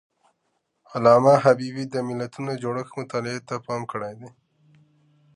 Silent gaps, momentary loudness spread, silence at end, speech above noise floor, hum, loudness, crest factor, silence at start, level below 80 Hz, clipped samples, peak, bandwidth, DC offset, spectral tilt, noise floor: none; 16 LU; 1.05 s; 51 dB; none; -23 LUFS; 22 dB; 0.9 s; -68 dBFS; under 0.1%; -2 dBFS; 11 kHz; under 0.1%; -6.5 dB/octave; -74 dBFS